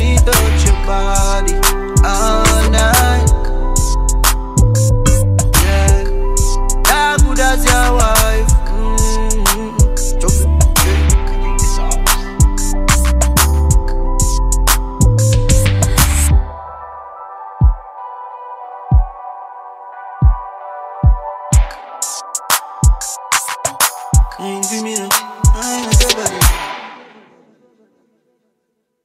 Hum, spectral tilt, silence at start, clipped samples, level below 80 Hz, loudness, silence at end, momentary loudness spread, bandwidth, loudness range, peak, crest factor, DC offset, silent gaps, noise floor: none; -4 dB/octave; 0 s; under 0.1%; -14 dBFS; -14 LUFS; 2.1 s; 17 LU; 16 kHz; 6 LU; 0 dBFS; 12 dB; under 0.1%; none; -68 dBFS